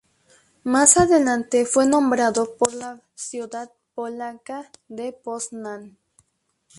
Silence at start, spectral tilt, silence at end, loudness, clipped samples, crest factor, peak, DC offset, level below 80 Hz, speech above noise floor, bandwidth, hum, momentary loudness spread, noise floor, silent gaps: 0.65 s; -3 dB/octave; 0.9 s; -19 LUFS; under 0.1%; 22 dB; -2 dBFS; under 0.1%; -54 dBFS; 48 dB; 11.5 kHz; none; 21 LU; -70 dBFS; none